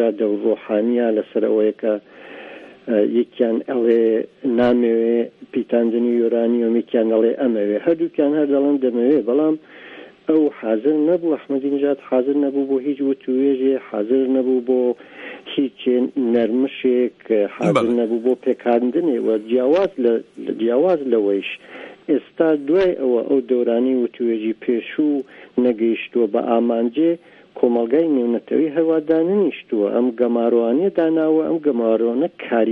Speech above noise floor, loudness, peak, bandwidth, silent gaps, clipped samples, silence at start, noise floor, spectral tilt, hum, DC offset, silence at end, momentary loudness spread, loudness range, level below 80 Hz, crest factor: 22 dB; -19 LUFS; -2 dBFS; 6.2 kHz; none; under 0.1%; 0 s; -40 dBFS; -8 dB/octave; none; under 0.1%; 0 s; 6 LU; 2 LU; -64 dBFS; 16 dB